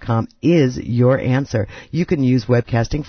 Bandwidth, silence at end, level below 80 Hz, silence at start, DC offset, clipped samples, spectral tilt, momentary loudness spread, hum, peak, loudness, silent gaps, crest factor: 6.6 kHz; 0 s; -38 dBFS; 0 s; under 0.1%; under 0.1%; -8 dB/octave; 8 LU; none; -4 dBFS; -18 LUFS; none; 14 dB